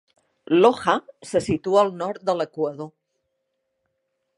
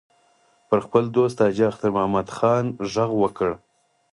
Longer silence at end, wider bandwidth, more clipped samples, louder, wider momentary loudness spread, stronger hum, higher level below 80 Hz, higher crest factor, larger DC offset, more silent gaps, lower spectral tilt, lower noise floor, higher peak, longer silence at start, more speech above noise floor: first, 1.5 s vs 0.55 s; about the same, 11.5 kHz vs 11.5 kHz; neither; about the same, -22 LUFS vs -22 LUFS; first, 11 LU vs 6 LU; neither; about the same, -58 dBFS vs -56 dBFS; about the same, 22 dB vs 20 dB; neither; neither; second, -5.5 dB/octave vs -7 dB/octave; first, -76 dBFS vs -61 dBFS; about the same, -2 dBFS vs -2 dBFS; second, 0.5 s vs 0.7 s; first, 55 dB vs 40 dB